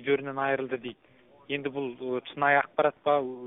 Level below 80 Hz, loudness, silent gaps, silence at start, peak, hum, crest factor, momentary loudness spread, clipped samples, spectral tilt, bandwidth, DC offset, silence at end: -72 dBFS; -28 LUFS; none; 0 s; -10 dBFS; none; 20 dB; 11 LU; under 0.1%; 0 dB/octave; 3.9 kHz; under 0.1%; 0 s